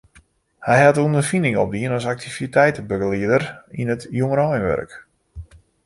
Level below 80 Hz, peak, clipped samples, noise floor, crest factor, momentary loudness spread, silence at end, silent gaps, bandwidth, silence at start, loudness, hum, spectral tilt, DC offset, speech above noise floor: -48 dBFS; -2 dBFS; under 0.1%; -54 dBFS; 18 dB; 12 LU; 0.4 s; none; 11.5 kHz; 0.6 s; -19 LUFS; none; -6.5 dB/octave; under 0.1%; 35 dB